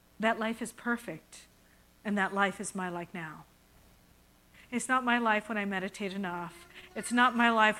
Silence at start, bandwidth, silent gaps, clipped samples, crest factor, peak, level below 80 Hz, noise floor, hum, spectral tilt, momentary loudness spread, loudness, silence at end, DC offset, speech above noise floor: 0.2 s; 16 kHz; none; under 0.1%; 22 dB; -10 dBFS; -68 dBFS; -62 dBFS; none; -4 dB/octave; 18 LU; -31 LUFS; 0 s; under 0.1%; 31 dB